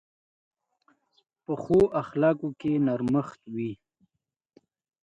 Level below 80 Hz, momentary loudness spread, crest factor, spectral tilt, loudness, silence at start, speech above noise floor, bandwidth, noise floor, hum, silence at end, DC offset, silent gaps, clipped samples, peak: -60 dBFS; 14 LU; 18 dB; -9 dB/octave; -27 LUFS; 1.5 s; 59 dB; 9.8 kHz; -84 dBFS; none; 1.3 s; under 0.1%; none; under 0.1%; -10 dBFS